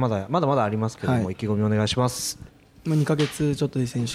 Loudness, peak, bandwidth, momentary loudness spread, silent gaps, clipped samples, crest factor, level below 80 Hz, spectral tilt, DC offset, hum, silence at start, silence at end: -24 LUFS; -10 dBFS; 15.5 kHz; 5 LU; none; under 0.1%; 14 dB; -52 dBFS; -6 dB/octave; under 0.1%; none; 0 s; 0 s